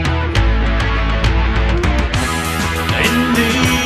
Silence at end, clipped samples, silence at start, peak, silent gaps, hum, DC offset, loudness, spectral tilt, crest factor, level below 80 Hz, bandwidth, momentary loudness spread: 0 s; under 0.1%; 0 s; 0 dBFS; none; none; 0.4%; -15 LUFS; -4.5 dB/octave; 14 dB; -18 dBFS; 14 kHz; 4 LU